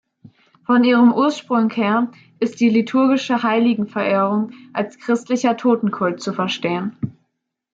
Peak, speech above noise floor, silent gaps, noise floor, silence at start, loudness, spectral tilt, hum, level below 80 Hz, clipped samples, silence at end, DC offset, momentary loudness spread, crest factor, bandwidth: -4 dBFS; 57 dB; none; -75 dBFS; 0.7 s; -18 LUFS; -6 dB/octave; none; -66 dBFS; under 0.1%; 0.65 s; under 0.1%; 11 LU; 14 dB; 7.8 kHz